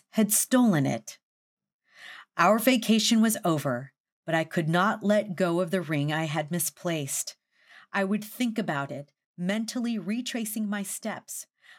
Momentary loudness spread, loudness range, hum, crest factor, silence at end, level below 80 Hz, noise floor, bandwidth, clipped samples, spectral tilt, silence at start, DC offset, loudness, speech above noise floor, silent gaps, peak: 14 LU; 6 LU; none; 20 dB; 0.35 s; -86 dBFS; -56 dBFS; 18 kHz; under 0.1%; -4.5 dB/octave; 0.15 s; under 0.1%; -27 LUFS; 30 dB; 1.23-1.57 s, 1.73-1.79 s, 4.00-4.04 s, 4.12-4.23 s, 9.26-9.34 s; -8 dBFS